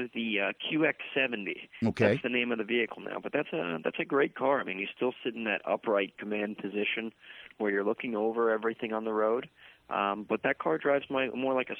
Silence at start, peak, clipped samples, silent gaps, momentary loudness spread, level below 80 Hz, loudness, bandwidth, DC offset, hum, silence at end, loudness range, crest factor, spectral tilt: 0 s; -12 dBFS; under 0.1%; none; 7 LU; -72 dBFS; -31 LUFS; 7.4 kHz; under 0.1%; none; 0 s; 2 LU; 20 dB; -7 dB/octave